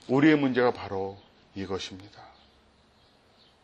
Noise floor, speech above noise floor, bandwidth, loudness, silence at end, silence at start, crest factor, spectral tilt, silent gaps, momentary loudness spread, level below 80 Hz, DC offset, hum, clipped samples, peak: -61 dBFS; 35 dB; 8.2 kHz; -27 LUFS; 1.4 s; 0.1 s; 20 dB; -6.5 dB/octave; none; 19 LU; -66 dBFS; under 0.1%; none; under 0.1%; -8 dBFS